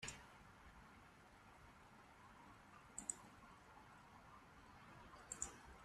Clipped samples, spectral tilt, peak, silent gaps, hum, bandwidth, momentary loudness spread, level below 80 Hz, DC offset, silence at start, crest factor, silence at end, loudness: under 0.1%; -2 dB/octave; -26 dBFS; none; none; 13 kHz; 15 LU; -72 dBFS; under 0.1%; 0 s; 34 dB; 0 s; -57 LUFS